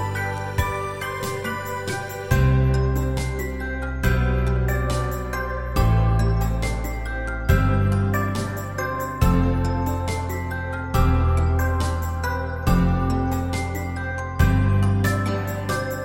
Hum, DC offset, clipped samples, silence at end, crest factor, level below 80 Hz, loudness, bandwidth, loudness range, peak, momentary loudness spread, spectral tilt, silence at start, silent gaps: none; under 0.1%; under 0.1%; 0 s; 18 dB; -26 dBFS; -23 LUFS; 17 kHz; 1 LU; -4 dBFS; 8 LU; -6.5 dB/octave; 0 s; none